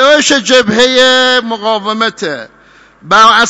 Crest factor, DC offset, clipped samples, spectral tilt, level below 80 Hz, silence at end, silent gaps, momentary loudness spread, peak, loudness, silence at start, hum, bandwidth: 10 dB; under 0.1%; 0.8%; -2 dB/octave; -46 dBFS; 0 s; none; 10 LU; 0 dBFS; -8 LUFS; 0 s; none; 11 kHz